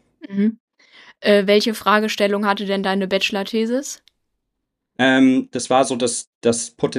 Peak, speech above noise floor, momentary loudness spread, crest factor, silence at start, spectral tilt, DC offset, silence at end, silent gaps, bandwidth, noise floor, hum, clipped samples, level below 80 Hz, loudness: -2 dBFS; 59 dB; 9 LU; 18 dB; 0.25 s; -4 dB/octave; under 0.1%; 0 s; 0.60-0.68 s, 6.27-6.41 s; 14.5 kHz; -77 dBFS; none; under 0.1%; -64 dBFS; -19 LUFS